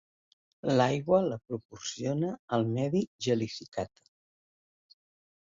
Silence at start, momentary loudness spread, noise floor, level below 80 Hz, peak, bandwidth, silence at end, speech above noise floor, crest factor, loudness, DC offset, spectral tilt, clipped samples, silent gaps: 0.65 s; 12 LU; under -90 dBFS; -66 dBFS; -12 dBFS; 7.8 kHz; 1.55 s; over 60 dB; 20 dB; -31 LUFS; under 0.1%; -6 dB/octave; under 0.1%; 1.65-1.69 s, 2.39-2.48 s, 3.07-3.19 s, 3.68-3.72 s